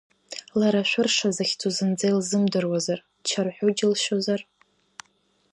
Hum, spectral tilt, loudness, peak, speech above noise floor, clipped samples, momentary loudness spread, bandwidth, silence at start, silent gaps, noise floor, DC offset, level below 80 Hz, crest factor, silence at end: none; -4 dB/octave; -24 LUFS; -10 dBFS; 43 dB; under 0.1%; 8 LU; 11 kHz; 0.3 s; none; -67 dBFS; under 0.1%; -72 dBFS; 16 dB; 1.1 s